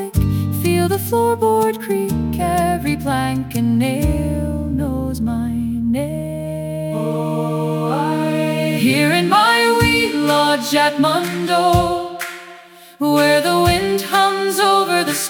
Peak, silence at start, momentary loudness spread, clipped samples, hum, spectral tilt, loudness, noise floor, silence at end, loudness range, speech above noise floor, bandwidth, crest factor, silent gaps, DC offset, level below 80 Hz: 0 dBFS; 0 s; 8 LU; under 0.1%; none; -5 dB/octave; -17 LUFS; -41 dBFS; 0 s; 6 LU; 24 dB; 18 kHz; 16 dB; none; under 0.1%; -34 dBFS